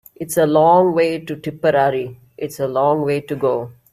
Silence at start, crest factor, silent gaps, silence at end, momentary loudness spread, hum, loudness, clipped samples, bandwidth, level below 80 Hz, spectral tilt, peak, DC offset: 0.2 s; 16 dB; none; 0.2 s; 14 LU; none; -17 LUFS; under 0.1%; 15.5 kHz; -58 dBFS; -6 dB/octave; -2 dBFS; under 0.1%